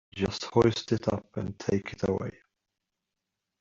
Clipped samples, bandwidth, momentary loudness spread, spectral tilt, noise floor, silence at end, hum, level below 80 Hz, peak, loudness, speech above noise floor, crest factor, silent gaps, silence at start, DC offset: under 0.1%; 7.6 kHz; 10 LU; -6 dB/octave; -86 dBFS; 1.3 s; none; -56 dBFS; -8 dBFS; -29 LUFS; 57 dB; 22 dB; none; 0.15 s; under 0.1%